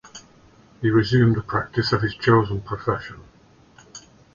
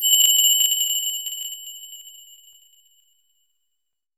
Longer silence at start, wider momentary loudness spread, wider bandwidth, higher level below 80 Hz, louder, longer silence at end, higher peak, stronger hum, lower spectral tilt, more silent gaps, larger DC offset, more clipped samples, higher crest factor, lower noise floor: first, 0.15 s vs 0 s; about the same, 24 LU vs 24 LU; second, 7.2 kHz vs over 20 kHz; first, -48 dBFS vs -76 dBFS; second, -21 LUFS vs -17 LUFS; second, 0.35 s vs 2.05 s; about the same, -4 dBFS vs -4 dBFS; neither; first, -7 dB/octave vs 7 dB/octave; neither; neither; neither; about the same, 20 dB vs 20 dB; second, -52 dBFS vs -81 dBFS